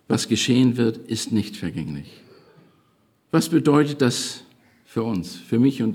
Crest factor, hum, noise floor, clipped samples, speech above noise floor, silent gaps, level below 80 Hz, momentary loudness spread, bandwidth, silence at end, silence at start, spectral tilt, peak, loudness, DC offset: 18 dB; none; -63 dBFS; under 0.1%; 41 dB; none; -62 dBFS; 13 LU; 16.5 kHz; 0 s; 0.1 s; -5.5 dB/octave; -6 dBFS; -22 LUFS; under 0.1%